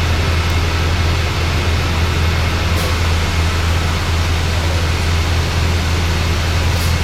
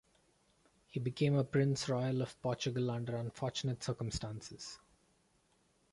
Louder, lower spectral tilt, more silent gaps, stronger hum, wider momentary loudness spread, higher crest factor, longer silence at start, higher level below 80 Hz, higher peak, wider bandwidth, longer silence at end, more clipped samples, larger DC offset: first, -16 LUFS vs -37 LUFS; second, -4.5 dB/octave vs -6 dB/octave; neither; neither; second, 1 LU vs 13 LU; second, 12 dB vs 18 dB; second, 0 s vs 0.95 s; first, -20 dBFS vs -62 dBFS; first, -4 dBFS vs -20 dBFS; first, 15 kHz vs 11.5 kHz; second, 0 s vs 1.15 s; neither; neither